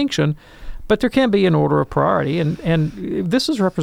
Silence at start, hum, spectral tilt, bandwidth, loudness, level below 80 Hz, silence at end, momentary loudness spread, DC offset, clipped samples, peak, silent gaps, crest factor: 0 s; none; -6.5 dB/octave; 14.5 kHz; -18 LUFS; -38 dBFS; 0 s; 6 LU; under 0.1%; under 0.1%; -4 dBFS; none; 14 dB